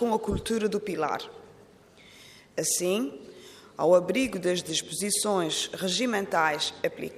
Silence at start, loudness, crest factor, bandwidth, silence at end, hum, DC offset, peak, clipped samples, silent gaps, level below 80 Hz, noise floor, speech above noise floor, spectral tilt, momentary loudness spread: 0 s; -27 LUFS; 20 dB; 15.5 kHz; 0 s; none; under 0.1%; -8 dBFS; under 0.1%; none; -54 dBFS; -54 dBFS; 27 dB; -3 dB/octave; 13 LU